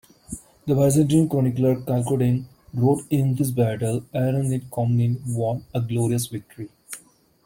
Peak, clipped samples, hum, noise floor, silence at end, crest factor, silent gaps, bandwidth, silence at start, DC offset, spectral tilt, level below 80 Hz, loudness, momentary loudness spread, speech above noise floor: -6 dBFS; under 0.1%; none; -51 dBFS; 0.45 s; 16 dB; none; 17 kHz; 0.3 s; under 0.1%; -7.5 dB/octave; -54 dBFS; -22 LUFS; 19 LU; 30 dB